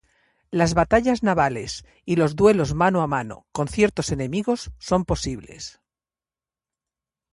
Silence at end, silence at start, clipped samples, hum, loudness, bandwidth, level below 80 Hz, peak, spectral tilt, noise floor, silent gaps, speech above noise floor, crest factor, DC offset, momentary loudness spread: 1.65 s; 0.5 s; under 0.1%; none; -22 LUFS; 11.5 kHz; -42 dBFS; -4 dBFS; -5.5 dB/octave; under -90 dBFS; none; over 68 dB; 20 dB; under 0.1%; 15 LU